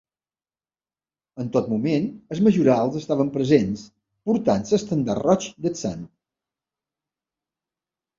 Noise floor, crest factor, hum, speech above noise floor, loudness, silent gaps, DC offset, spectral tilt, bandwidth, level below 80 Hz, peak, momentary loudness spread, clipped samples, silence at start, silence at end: under -90 dBFS; 20 dB; none; over 69 dB; -22 LUFS; none; under 0.1%; -7 dB/octave; 7.6 kHz; -58 dBFS; -4 dBFS; 11 LU; under 0.1%; 1.35 s; 2.15 s